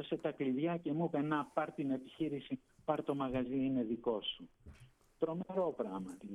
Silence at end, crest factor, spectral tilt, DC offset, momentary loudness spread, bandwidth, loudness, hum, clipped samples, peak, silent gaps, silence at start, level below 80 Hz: 0 s; 18 dB; -7.5 dB/octave; under 0.1%; 7 LU; 11 kHz; -38 LUFS; none; under 0.1%; -20 dBFS; none; 0 s; -68 dBFS